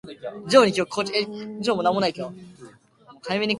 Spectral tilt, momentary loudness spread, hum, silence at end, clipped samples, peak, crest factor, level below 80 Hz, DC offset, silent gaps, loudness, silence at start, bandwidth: -4.5 dB/octave; 19 LU; none; 0 s; under 0.1%; 0 dBFS; 24 dB; -64 dBFS; under 0.1%; none; -22 LUFS; 0.05 s; 11.5 kHz